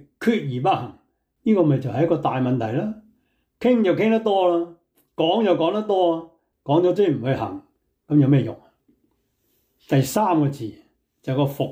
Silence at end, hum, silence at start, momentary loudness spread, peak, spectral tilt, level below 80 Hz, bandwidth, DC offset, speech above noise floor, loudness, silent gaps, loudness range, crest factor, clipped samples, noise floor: 0 s; none; 0.2 s; 13 LU; -6 dBFS; -7 dB/octave; -62 dBFS; 16.5 kHz; under 0.1%; 49 dB; -21 LUFS; none; 3 LU; 14 dB; under 0.1%; -69 dBFS